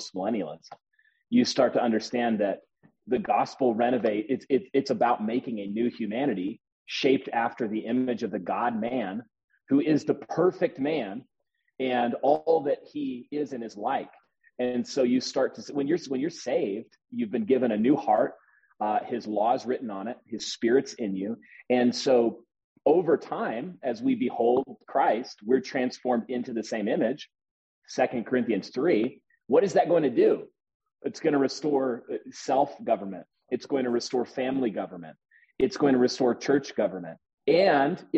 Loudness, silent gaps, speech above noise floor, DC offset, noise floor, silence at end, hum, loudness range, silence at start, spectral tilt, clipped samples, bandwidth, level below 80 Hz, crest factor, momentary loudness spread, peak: -27 LUFS; 6.72-6.86 s, 9.44-9.48 s, 22.64-22.76 s, 27.51-27.82 s, 30.74-30.80 s, 37.34-37.38 s; 28 dB; under 0.1%; -54 dBFS; 0 s; none; 3 LU; 0 s; -5.5 dB/octave; under 0.1%; 8.2 kHz; -72 dBFS; 18 dB; 12 LU; -8 dBFS